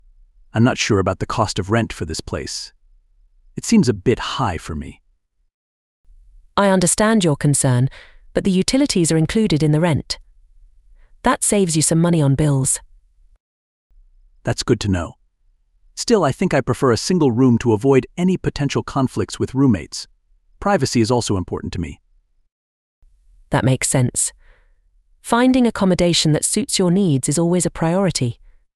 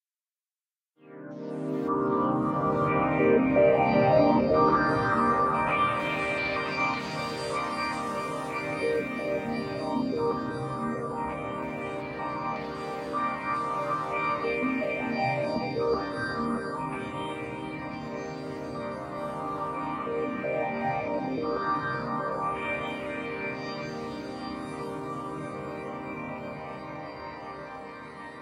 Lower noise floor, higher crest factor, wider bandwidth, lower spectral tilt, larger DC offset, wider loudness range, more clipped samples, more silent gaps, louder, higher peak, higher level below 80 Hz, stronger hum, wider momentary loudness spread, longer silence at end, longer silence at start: second, -62 dBFS vs under -90 dBFS; about the same, 18 dB vs 20 dB; second, 13.5 kHz vs 15 kHz; second, -5 dB/octave vs -6.5 dB/octave; neither; second, 6 LU vs 12 LU; neither; first, 5.54-6.04 s, 13.40-13.90 s, 22.52-23.02 s vs none; first, -18 LUFS vs -29 LUFS; first, -2 dBFS vs -8 dBFS; first, -42 dBFS vs -56 dBFS; neither; about the same, 12 LU vs 14 LU; first, 0.45 s vs 0 s; second, 0.55 s vs 1.05 s